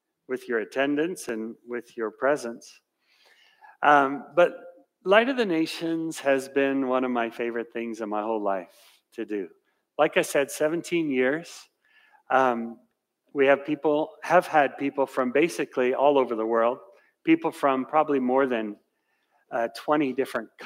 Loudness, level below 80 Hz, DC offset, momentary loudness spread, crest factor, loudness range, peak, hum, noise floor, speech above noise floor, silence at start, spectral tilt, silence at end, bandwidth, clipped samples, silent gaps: -25 LUFS; -82 dBFS; under 0.1%; 14 LU; 20 dB; 5 LU; -6 dBFS; none; -73 dBFS; 49 dB; 0.3 s; -4.5 dB/octave; 0 s; 16 kHz; under 0.1%; none